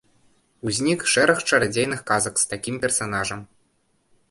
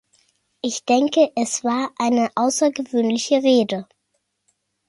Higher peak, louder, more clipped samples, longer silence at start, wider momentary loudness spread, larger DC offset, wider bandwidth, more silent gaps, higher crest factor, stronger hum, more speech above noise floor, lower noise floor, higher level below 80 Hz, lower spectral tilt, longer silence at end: about the same, -4 dBFS vs -4 dBFS; about the same, -21 LUFS vs -20 LUFS; neither; about the same, 0.65 s vs 0.65 s; about the same, 9 LU vs 9 LU; neither; about the same, 12 kHz vs 11.5 kHz; neither; about the same, 20 dB vs 16 dB; neither; second, 44 dB vs 54 dB; second, -66 dBFS vs -73 dBFS; first, -56 dBFS vs -70 dBFS; about the same, -3 dB/octave vs -3.5 dB/octave; second, 0.85 s vs 1.05 s